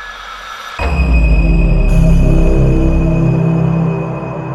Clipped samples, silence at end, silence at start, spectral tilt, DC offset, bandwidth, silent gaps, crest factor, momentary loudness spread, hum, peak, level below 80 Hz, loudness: under 0.1%; 0 s; 0 s; -8 dB/octave; under 0.1%; 11.5 kHz; none; 10 dB; 13 LU; none; 0 dBFS; -14 dBFS; -13 LUFS